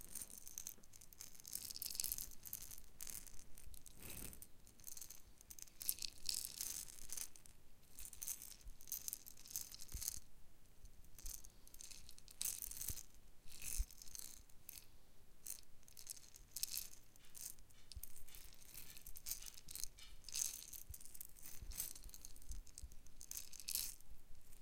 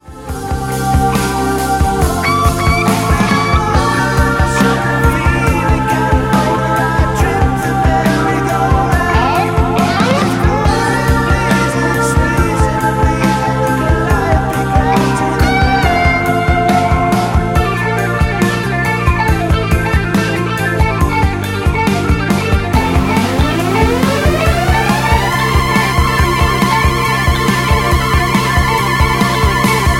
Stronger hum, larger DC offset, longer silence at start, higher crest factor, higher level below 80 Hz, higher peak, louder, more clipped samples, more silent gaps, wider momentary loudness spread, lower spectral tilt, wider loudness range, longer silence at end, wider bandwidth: neither; neither; about the same, 0 s vs 0.05 s; first, 36 dB vs 12 dB; second, -60 dBFS vs -20 dBFS; second, -14 dBFS vs 0 dBFS; second, -49 LUFS vs -13 LUFS; neither; neither; first, 17 LU vs 2 LU; second, -0.5 dB/octave vs -5.5 dB/octave; first, 5 LU vs 2 LU; about the same, 0 s vs 0 s; about the same, 17 kHz vs 16.5 kHz